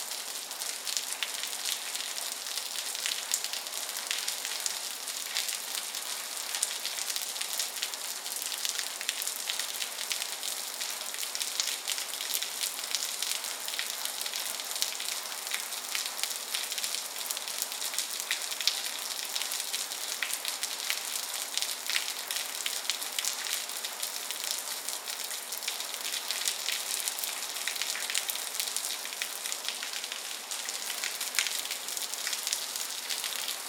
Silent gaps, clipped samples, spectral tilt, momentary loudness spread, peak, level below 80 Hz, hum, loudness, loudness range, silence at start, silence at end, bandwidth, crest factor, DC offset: none; under 0.1%; 3.5 dB/octave; 4 LU; -4 dBFS; under -90 dBFS; none; -32 LUFS; 1 LU; 0 s; 0 s; 19 kHz; 32 dB; under 0.1%